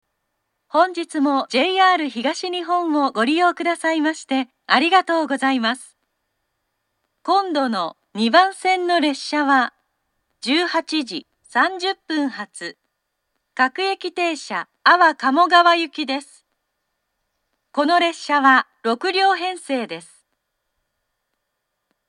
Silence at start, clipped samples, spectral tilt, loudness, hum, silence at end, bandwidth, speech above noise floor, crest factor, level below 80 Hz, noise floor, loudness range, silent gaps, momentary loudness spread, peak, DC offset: 0.75 s; under 0.1%; -3 dB/octave; -19 LUFS; none; 2.1 s; 11 kHz; 58 dB; 20 dB; -80 dBFS; -76 dBFS; 5 LU; none; 12 LU; 0 dBFS; under 0.1%